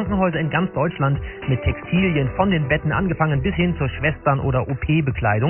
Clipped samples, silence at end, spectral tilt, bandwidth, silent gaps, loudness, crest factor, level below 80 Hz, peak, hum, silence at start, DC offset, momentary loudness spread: under 0.1%; 0 s; -12.5 dB/octave; 3.2 kHz; none; -21 LUFS; 16 dB; -34 dBFS; -2 dBFS; none; 0 s; under 0.1%; 3 LU